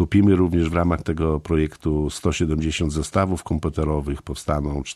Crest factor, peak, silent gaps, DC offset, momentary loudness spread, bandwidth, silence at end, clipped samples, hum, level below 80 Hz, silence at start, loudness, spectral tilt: 16 dB; -4 dBFS; none; under 0.1%; 7 LU; 13 kHz; 0 s; under 0.1%; none; -32 dBFS; 0 s; -22 LUFS; -6.5 dB/octave